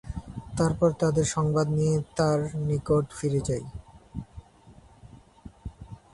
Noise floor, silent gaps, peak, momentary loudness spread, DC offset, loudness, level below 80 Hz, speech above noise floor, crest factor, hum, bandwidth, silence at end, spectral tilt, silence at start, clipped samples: -53 dBFS; none; -10 dBFS; 20 LU; under 0.1%; -26 LUFS; -46 dBFS; 28 dB; 18 dB; none; 11.5 kHz; 0.15 s; -6.5 dB/octave; 0.05 s; under 0.1%